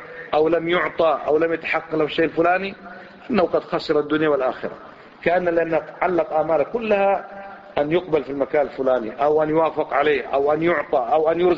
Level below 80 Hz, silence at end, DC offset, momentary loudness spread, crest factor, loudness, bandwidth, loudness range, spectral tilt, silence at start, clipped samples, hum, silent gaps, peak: -54 dBFS; 0 s; under 0.1%; 7 LU; 18 dB; -21 LUFS; 7.2 kHz; 2 LU; -7.5 dB/octave; 0 s; under 0.1%; none; none; -4 dBFS